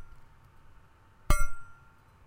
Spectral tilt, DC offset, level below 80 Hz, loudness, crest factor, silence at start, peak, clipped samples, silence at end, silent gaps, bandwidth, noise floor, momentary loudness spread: -4 dB/octave; under 0.1%; -34 dBFS; -33 LUFS; 22 dB; 0 s; -8 dBFS; under 0.1%; 0.55 s; none; 16 kHz; -58 dBFS; 26 LU